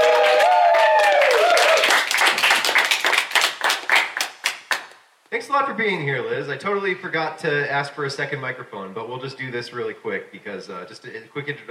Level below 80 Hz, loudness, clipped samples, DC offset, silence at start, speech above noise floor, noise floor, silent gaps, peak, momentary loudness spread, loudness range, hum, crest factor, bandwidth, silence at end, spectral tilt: -78 dBFS; -19 LUFS; under 0.1%; under 0.1%; 0 s; 21 dB; -47 dBFS; none; 0 dBFS; 17 LU; 13 LU; none; 20 dB; 16.5 kHz; 0.05 s; -2 dB/octave